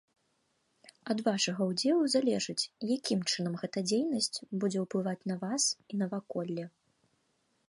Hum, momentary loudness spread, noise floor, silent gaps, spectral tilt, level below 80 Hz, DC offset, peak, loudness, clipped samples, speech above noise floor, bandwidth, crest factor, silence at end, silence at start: none; 8 LU; -76 dBFS; none; -4 dB/octave; -80 dBFS; under 0.1%; -16 dBFS; -32 LUFS; under 0.1%; 44 dB; 11.5 kHz; 18 dB; 1 s; 1.05 s